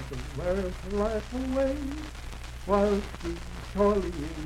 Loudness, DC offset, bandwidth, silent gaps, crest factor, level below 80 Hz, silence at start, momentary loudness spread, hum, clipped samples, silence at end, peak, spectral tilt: -30 LUFS; under 0.1%; 15.5 kHz; none; 18 dB; -38 dBFS; 0 s; 13 LU; none; under 0.1%; 0 s; -10 dBFS; -6.5 dB/octave